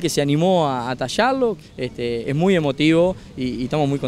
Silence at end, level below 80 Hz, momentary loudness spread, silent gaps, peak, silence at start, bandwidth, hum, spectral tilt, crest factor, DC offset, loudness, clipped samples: 0 s; -46 dBFS; 10 LU; none; -4 dBFS; 0 s; 15.5 kHz; none; -6 dB/octave; 16 dB; under 0.1%; -20 LUFS; under 0.1%